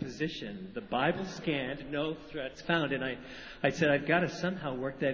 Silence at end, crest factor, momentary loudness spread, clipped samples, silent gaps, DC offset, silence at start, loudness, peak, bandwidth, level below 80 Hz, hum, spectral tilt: 0 s; 22 dB; 12 LU; under 0.1%; none; under 0.1%; 0 s; -33 LUFS; -12 dBFS; 7.6 kHz; -60 dBFS; none; -5.5 dB/octave